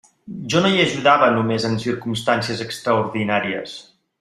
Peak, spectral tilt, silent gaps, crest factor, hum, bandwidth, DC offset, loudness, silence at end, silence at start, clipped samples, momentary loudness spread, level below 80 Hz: -2 dBFS; -5 dB/octave; none; 18 dB; none; 14.5 kHz; under 0.1%; -19 LUFS; 0.4 s; 0.25 s; under 0.1%; 15 LU; -58 dBFS